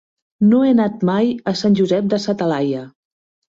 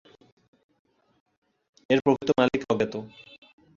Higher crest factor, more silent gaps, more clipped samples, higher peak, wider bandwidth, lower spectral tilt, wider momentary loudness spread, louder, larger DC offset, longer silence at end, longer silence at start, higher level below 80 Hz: second, 12 dB vs 24 dB; neither; neither; about the same, -4 dBFS vs -6 dBFS; about the same, 7.6 kHz vs 7.4 kHz; about the same, -7 dB/octave vs -6 dB/octave; second, 6 LU vs 12 LU; first, -17 LUFS vs -25 LUFS; neither; about the same, 0.65 s vs 0.7 s; second, 0.4 s vs 1.9 s; about the same, -58 dBFS vs -62 dBFS